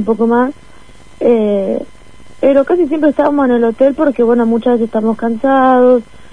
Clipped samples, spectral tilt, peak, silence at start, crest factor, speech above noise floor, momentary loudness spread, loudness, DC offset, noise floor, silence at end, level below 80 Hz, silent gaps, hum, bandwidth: under 0.1%; -8 dB/octave; 0 dBFS; 0 s; 12 dB; 29 dB; 6 LU; -12 LUFS; 2%; -41 dBFS; 0.3 s; -46 dBFS; none; none; 10 kHz